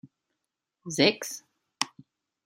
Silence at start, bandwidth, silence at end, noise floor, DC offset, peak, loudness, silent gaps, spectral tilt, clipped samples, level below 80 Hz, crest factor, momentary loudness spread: 0.05 s; 16 kHz; 0.6 s; -85 dBFS; under 0.1%; -4 dBFS; -28 LUFS; none; -3 dB/octave; under 0.1%; -76 dBFS; 28 dB; 18 LU